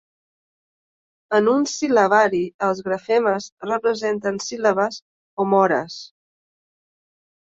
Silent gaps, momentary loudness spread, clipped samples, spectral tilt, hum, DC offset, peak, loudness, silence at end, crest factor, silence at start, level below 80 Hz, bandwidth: 2.54-2.59 s, 3.52-3.57 s, 5.02-5.37 s; 9 LU; under 0.1%; -4.5 dB/octave; none; under 0.1%; -4 dBFS; -20 LUFS; 1.4 s; 18 dB; 1.3 s; -66 dBFS; 7.8 kHz